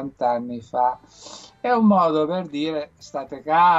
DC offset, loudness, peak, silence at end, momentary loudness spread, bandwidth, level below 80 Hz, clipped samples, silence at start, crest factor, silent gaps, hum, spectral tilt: under 0.1%; -22 LUFS; -8 dBFS; 0 s; 18 LU; 8 kHz; -62 dBFS; under 0.1%; 0 s; 14 dB; none; none; -6.5 dB/octave